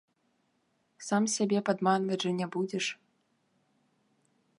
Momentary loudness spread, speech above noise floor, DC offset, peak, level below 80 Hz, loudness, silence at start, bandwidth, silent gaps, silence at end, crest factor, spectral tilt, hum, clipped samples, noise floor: 7 LU; 45 dB; under 0.1%; -12 dBFS; -82 dBFS; -30 LUFS; 1 s; 11.5 kHz; none; 1.65 s; 22 dB; -4.5 dB/octave; none; under 0.1%; -74 dBFS